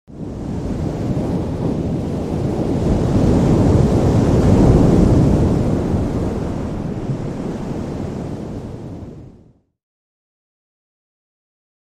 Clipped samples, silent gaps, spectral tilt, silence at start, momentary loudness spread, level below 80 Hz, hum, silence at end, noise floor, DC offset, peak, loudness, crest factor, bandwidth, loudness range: under 0.1%; none; -8.5 dB/octave; 0.1 s; 16 LU; -28 dBFS; none; 2.6 s; -49 dBFS; under 0.1%; -2 dBFS; -17 LUFS; 16 dB; 12 kHz; 16 LU